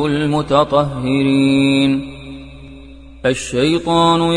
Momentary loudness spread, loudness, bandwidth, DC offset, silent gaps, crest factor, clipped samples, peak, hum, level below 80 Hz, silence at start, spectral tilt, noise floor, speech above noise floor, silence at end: 19 LU; -15 LUFS; 10 kHz; under 0.1%; none; 16 dB; under 0.1%; 0 dBFS; none; -40 dBFS; 0 s; -6 dB/octave; -37 dBFS; 22 dB; 0 s